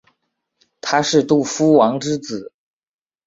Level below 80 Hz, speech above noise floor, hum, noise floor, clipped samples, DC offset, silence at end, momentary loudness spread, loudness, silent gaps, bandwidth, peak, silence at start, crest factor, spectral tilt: -60 dBFS; 56 dB; none; -72 dBFS; under 0.1%; under 0.1%; 0.8 s; 16 LU; -16 LUFS; none; 8 kHz; -2 dBFS; 0.85 s; 18 dB; -4.5 dB/octave